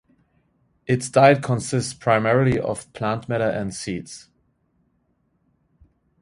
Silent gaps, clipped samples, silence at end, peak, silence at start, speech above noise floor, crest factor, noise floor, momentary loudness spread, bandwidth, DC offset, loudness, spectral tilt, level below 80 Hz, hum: none; under 0.1%; 2.05 s; 0 dBFS; 0.9 s; 47 dB; 22 dB; -67 dBFS; 16 LU; 11.5 kHz; under 0.1%; -21 LUFS; -5.5 dB/octave; -52 dBFS; none